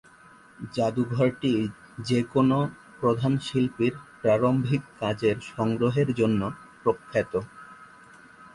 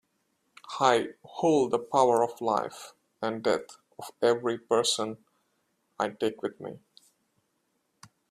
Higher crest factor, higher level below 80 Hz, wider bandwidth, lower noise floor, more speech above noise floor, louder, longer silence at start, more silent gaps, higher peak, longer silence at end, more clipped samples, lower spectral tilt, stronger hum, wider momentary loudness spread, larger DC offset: second, 16 dB vs 24 dB; first, -58 dBFS vs -74 dBFS; second, 11.5 kHz vs 14.5 kHz; second, -53 dBFS vs -76 dBFS; second, 28 dB vs 49 dB; about the same, -26 LUFS vs -28 LUFS; about the same, 0.6 s vs 0.65 s; neither; second, -10 dBFS vs -6 dBFS; second, 0.1 s vs 1.55 s; neither; first, -7.5 dB/octave vs -4 dB/octave; neither; second, 10 LU vs 19 LU; neither